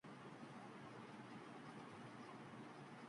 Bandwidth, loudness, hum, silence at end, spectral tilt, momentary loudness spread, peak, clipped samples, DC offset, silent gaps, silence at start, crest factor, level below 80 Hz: 11 kHz; -57 LUFS; none; 0 s; -5.5 dB/octave; 1 LU; -44 dBFS; under 0.1%; under 0.1%; none; 0.05 s; 12 dB; -90 dBFS